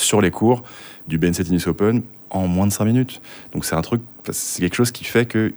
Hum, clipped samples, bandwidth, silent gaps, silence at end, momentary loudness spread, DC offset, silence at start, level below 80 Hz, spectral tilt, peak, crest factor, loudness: none; under 0.1%; over 20 kHz; none; 0 s; 10 LU; under 0.1%; 0 s; -46 dBFS; -5 dB/octave; -2 dBFS; 18 dB; -20 LUFS